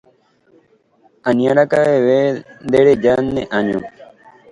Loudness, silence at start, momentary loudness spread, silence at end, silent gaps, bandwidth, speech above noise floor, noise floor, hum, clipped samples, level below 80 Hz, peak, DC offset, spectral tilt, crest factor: -15 LUFS; 1.25 s; 12 LU; 0.5 s; none; 11 kHz; 41 dB; -55 dBFS; none; under 0.1%; -52 dBFS; 0 dBFS; under 0.1%; -7 dB/octave; 16 dB